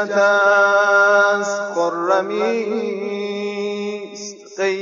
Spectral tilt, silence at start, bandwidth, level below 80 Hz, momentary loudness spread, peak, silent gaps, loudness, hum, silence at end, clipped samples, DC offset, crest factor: -3.5 dB/octave; 0 s; 7.6 kHz; -86 dBFS; 14 LU; -4 dBFS; none; -17 LUFS; none; 0 s; under 0.1%; under 0.1%; 14 dB